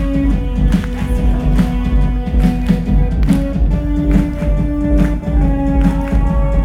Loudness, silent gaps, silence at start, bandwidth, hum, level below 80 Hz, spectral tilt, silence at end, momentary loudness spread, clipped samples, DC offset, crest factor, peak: -16 LUFS; none; 0 s; 10 kHz; none; -16 dBFS; -8.5 dB/octave; 0 s; 2 LU; under 0.1%; under 0.1%; 12 dB; 0 dBFS